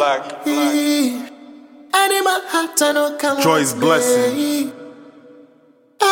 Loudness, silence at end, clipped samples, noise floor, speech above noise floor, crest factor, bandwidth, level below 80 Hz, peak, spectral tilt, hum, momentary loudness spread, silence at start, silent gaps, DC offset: -17 LUFS; 0 s; under 0.1%; -52 dBFS; 35 dB; 18 dB; 17 kHz; -68 dBFS; 0 dBFS; -3 dB/octave; none; 8 LU; 0 s; none; under 0.1%